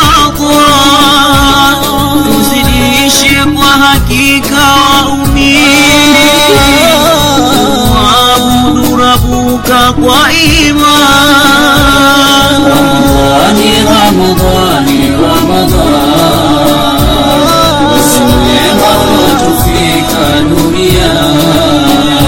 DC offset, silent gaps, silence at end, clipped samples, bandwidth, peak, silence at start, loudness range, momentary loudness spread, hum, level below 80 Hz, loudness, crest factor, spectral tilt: under 0.1%; none; 0 s; 4%; over 20 kHz; 0 dBFS; 0 s; 3 LU; 4 LU; none; -20 dBFS; -5 LUFS; 6 dB; -4 dB/octave